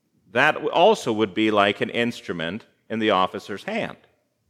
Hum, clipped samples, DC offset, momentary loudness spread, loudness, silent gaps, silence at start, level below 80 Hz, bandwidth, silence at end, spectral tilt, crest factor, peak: none; under 0.1%; under 0.1%; 13 LU; -22 LUFS; none; 0.35 s; -70 dBFS; 14.5 kHz; 0.6 s; -5 dB/octave; 22 dB; -2 dBFS